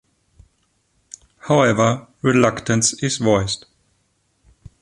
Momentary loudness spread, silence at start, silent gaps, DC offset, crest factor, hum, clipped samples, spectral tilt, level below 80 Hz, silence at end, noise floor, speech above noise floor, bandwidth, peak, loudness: 8 LU; 1.45 s; none; under 0.1%; 20 dB; none; under 0.1%; -4.5 dB/octave; -48 dBFS; 1.25 s; -66 dBFS; 48 dB; 11.5 kHz; 0 dBFS; -18 LUFS